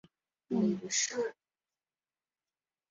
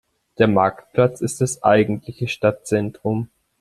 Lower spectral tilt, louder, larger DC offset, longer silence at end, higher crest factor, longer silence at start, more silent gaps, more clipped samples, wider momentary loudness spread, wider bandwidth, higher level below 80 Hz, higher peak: second, -4.5 dB/octave vs -6 dB/octave; second, -33 LUFS vs -20 LUFS; neither; first, 1.6 s vs 0.35 s; about the same, 18 dB vs 18 dB; about the same, 0.5 s vs 0.4 s; neither; neither; second, 7 LU vs 10 LU; second, 7.6 kHz vs 13 kHz; second, -78 dBFS vs -54 dBFS; second, -20 dBFS vs -2 dBFS